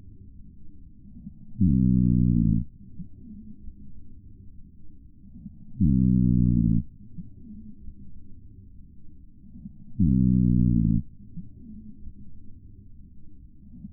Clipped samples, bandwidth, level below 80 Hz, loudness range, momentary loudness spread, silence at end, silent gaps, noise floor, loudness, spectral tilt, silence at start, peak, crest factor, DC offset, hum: under 0.1%; 0.8 kHz; -36 dBFS; 8 LU; 25 LU; 0 s; none; -46 dBFS; -23 LUFS; -21 dB/octave; 0.05 s; -10 dBFS; 16 dB; under 0.1%; none